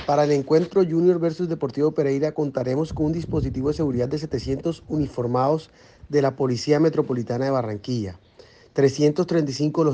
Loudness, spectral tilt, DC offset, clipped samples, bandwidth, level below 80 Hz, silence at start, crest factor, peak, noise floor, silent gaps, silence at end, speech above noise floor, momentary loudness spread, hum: -23 LUFS; -7 dB/octave; under 0.1%; under 0.1%; 9.2 kHz; -46 dBFS; 0 s; 16 dB; -6 dBFS; -51 dBFS; none; 0 s; 29 dB; 8 LU; none